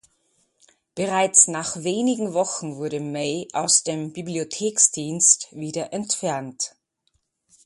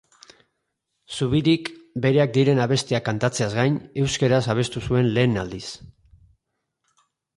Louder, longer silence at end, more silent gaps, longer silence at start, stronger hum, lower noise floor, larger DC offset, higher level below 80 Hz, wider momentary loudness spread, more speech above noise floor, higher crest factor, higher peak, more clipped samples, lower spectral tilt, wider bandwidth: about the same, -21 LUFS vs -22 LUFS; second, 1 s vs 1.5 s; neither; second, 0.95 s vs 1.1 s; neither; second, -71 dBFS vs -77 dBFS; neither; second, -68 dBFS vs -50 dBFS; about the same, 14 LU vs 13 LU; second, 48 dB vs 56 dB; first, 24 dB vs 18 dB; first, 0 dBFS vs -6 dBFS; neither; second, -2.5 dB/octave vs -6 dB/octave; about the same, 11.5 kHz vs 11.5 kHz